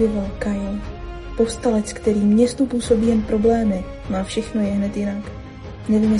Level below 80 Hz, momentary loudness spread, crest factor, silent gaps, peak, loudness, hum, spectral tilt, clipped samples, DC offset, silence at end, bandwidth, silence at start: -36 dBFS; 15 LU; 16 dB; none; -4 dBFS; -20 LUFS; none; -6.5 dB/octave; under 0.1%; under 0.1%; 0 s; 11.5 kHz; 0 s